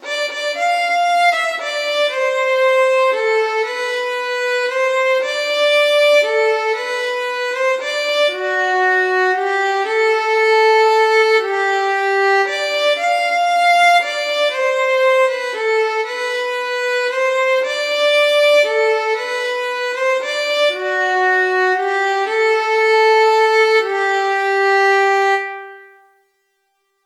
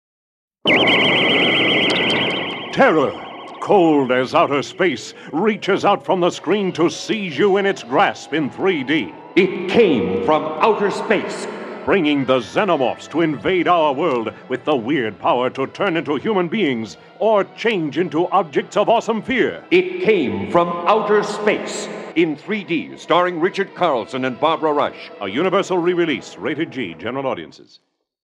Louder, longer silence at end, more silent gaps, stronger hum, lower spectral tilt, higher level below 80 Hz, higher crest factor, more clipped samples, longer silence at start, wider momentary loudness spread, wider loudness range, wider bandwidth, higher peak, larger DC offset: first, -15 LUFS vs -18 LUFS; first, 1.2 s vs 0.75 s; neither; neither; second, 1.5 dB/octave vs -5 dB/octave; second, under -90 dBFS vs -62 dBFS; second, 12 dB vs 18 dB; neither; second, 0 s vs 0.65 s; second, 7 LU vs 10 LU; about the same, 3 LU vs 4 LU; first, 15 kHz vs 11 kHz; second, -4 dBFS vs 0 dBFS; neither